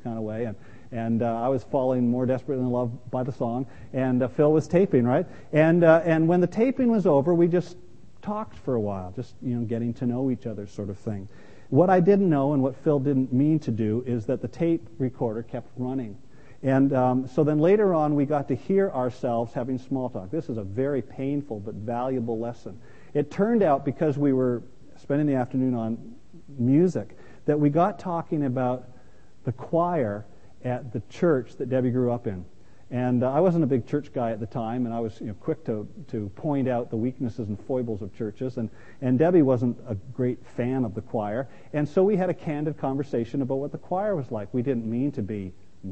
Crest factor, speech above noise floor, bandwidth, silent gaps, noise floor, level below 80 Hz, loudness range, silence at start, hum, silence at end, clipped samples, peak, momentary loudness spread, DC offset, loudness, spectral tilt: 22 dB; 30 dB; 8.4 kHz; none; -55 dBFS; -58 dBFS; 8 LU; 0.05 s; none; 0 s; under 0.1%; -4 dBFS; 13 LU; 0.7%; -25 LUFS; -9.5 dB/octave